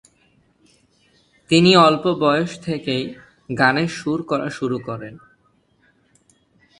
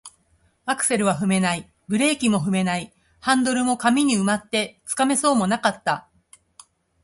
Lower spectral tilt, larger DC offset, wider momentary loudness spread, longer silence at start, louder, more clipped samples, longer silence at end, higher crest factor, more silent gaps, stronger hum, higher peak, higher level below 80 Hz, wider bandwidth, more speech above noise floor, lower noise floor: first, -5.5 dB/octave vs -4 dB/octave; neither; first, 18 LU vs 9 LU; first, 1.5 s vs 0.05 s; first, -18 LUFS vs -21 LUFS; neither; first, 1.65 s vs 1.05 s; first, 22 dB vs 16 dB; neither; neither; first, 0 dBFS vs -6 dBFS; about the same, -58 dBFS vs -60 dBFS; about the same, 11 kHz vs 11.5 kHz; about the same, 43 dB vs 42 dB; about the same, -61 dBFS vs -63 dBFS